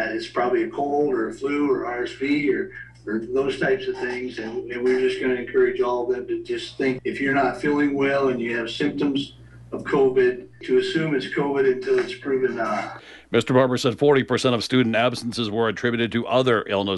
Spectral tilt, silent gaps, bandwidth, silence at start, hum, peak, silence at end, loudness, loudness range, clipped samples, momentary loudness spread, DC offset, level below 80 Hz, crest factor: -5.5 dB/octave; none; 11.5 kHz; 0 s; none; -6 dBFS; 0 s; -23 LUFS; 3 LU; under 0.1%; 9 LU; under 0.1%; -56 dBFS; 18 dB